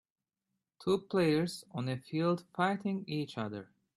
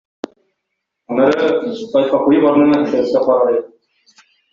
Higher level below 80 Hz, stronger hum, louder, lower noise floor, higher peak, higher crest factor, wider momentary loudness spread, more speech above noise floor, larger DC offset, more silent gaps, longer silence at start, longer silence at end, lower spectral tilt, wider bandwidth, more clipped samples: second, -74 dBFS vs -58 dBFS; neither; second, -34 LUFS vs -14 LUFS; first, -87 dBFS vs -75 dBFS; second, -16 dBFS vs -2 dBFS; about the same, 18 dB vs 14 dB; about the same, 10 LU vs 11 LU; second, 54 dB vs 62 dB; neither; neither; second, 0.8 s vs 1.1 s; second, 0.35 s vs 0.85 s; about the same, -6.5 dB/octave vs -7 dB/octave; first, 13 kHz vs 7.2 kHz; neither